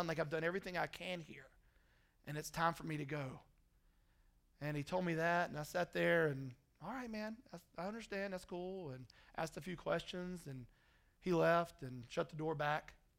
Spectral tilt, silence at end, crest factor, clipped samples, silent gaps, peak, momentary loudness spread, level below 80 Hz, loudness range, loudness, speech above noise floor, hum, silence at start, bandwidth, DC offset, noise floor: -5.5 dB/octave; 0.25 s; 20 dB; under 0.1%; none; -22 dBFS; 17 LU; -68 dBFS; 6 LU; -41 LUFS; 32 dB; none; 0 s; 16 kHz; under 0.1%; -73 dBFS